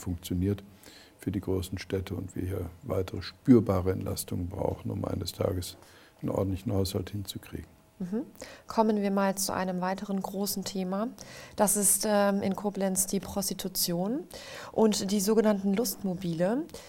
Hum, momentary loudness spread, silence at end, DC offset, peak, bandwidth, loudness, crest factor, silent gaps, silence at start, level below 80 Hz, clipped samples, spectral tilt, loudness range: none; 13 LU; 0 s; under 0.1%; -8 dBFS; 17 kHz; -29 LUFS; 20 dB; none; 0 s; -54 dBFS; under 0.1%; -5 dB/octave; 6 LU